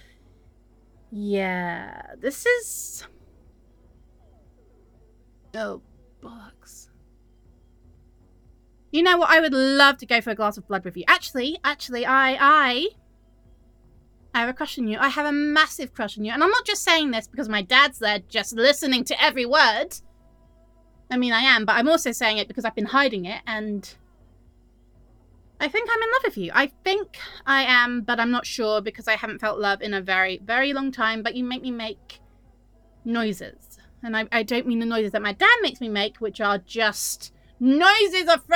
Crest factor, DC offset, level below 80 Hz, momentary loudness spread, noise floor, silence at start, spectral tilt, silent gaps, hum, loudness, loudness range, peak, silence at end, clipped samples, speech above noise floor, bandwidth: 22 dB; under 0.1%; -56 dBFS; 15 LU; -56 dBFS; 1.1 s; -2.5 dB/octave; none; none; -21 LUFS; 11 LU; -2 dBFS; 0 s; under 0.1%; 33 dB; over 20 kHz